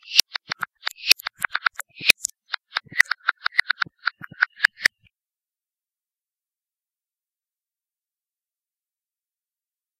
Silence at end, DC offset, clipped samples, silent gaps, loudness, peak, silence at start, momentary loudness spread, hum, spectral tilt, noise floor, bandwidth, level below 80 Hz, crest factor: 5.15 s; under 0.1%; under 0.1%; none; -22 LUFS; 0 dBFS; 0.1 s; 11 LU; none; 1.5 dB/octave; under -90 dBFS; 16 kHz; -68 dBFS; 28 dB